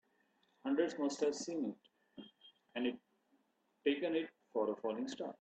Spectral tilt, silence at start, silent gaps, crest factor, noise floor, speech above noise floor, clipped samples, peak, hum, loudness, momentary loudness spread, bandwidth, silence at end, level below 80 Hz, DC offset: -4 dB/octave; 0.65 s; none; 20 dB; -78 dBFS; 40 dB; under 0.1%; -22 dBFS; none; -39 LUFS; 21 LU; 8.8 kHz; 0.1 s; -86 dBFS; under 0.1%